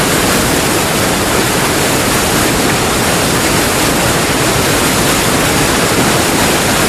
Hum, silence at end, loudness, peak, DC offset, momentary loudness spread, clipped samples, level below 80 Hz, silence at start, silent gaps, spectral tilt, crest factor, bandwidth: none; 0 s; -11 LUFS; 0 dBFS; 0.3%; 1 LU; under 0.1%; -28 dBFS; 0 s; none; -3 dB/octave; 12 dB; 15.5 kHz